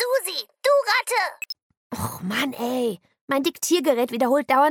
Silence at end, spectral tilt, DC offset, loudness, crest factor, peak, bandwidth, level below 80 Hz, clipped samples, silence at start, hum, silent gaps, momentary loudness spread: 0 s; -3 dB/octave; under 0.1%; -23 LUFS; 16 dB; -6 dBFS; 19.5 kHz; -64 dBFS; under 0.1%; 0 s; none; 1.62-1.70 s, 1.77-1.90 s, 3.21-3.28 s; 14 LU